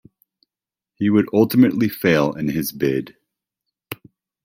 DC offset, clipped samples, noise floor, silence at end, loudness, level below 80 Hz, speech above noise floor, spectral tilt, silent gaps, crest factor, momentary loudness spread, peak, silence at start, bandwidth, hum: under 0.1%; under 0.1%; -90 dBFS; 0.5 s; -19 LUFS; -56 dBFS; 72 dB; -6.5 dB/octave; none; 18 dB; 20 LU; -2 dBFS; 1 s; 16.5 kHz; none